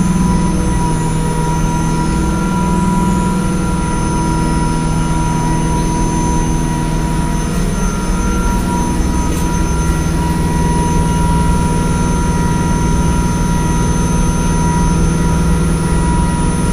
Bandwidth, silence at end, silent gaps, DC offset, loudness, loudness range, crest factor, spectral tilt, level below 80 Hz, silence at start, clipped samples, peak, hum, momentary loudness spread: 15.5 kHz; 0 s; none; under 0.1%; -15 LUFS; 2 LU; 12 dB; -6 dB/octave; -18 dBFS; 0 s; under 0.1%; -2 dBFS; none; 3 LU